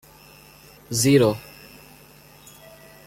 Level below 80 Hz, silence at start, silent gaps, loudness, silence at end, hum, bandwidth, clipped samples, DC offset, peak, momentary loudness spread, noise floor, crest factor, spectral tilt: -56 dBFS; 0.9 s; none; -20 LUFS; 1.65 s; 50 Hz at -50 dBFS; 16.5 kHz; under 0.1%; under 0.1%; -6 dBFS; 27 LU; -49 dBFS; 20 dB; -5 dB/octave